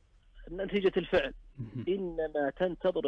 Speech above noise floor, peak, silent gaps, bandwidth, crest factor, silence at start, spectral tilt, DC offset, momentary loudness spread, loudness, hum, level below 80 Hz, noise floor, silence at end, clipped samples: 21 dB; -18 dBFS; none; 6.6 kHz; 14 dB; 0.35 s; -7.5 dB/octave; under 0.1%; 12 LU; -32 LUFS; none; -52 dBFS; -53 dBFS; 0 s; under 0.1%